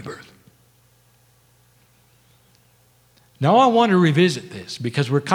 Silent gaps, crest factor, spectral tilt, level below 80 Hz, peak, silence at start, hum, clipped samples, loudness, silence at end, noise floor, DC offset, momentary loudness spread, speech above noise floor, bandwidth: none; 20 dB; -6 dB/octave; -66 dBFS; -2 dBFS; 0 s; 60 Hz at -45 dBFS; under 0.1%; -18 LUFS; 0 s; -57 dBFS; under 0.1%; 19 LU; 40 dB; 15 kHz